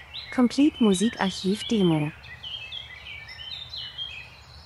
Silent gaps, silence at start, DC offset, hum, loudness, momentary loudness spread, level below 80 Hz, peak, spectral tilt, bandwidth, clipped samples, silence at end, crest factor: none; 0 s; under 0.1%; none; -26 LUFS; 17 LU; -54 dBFS; -8 dBFS; -5.5 dB/octave; 12 kHz; under 0.1%; 0 s; 18 dB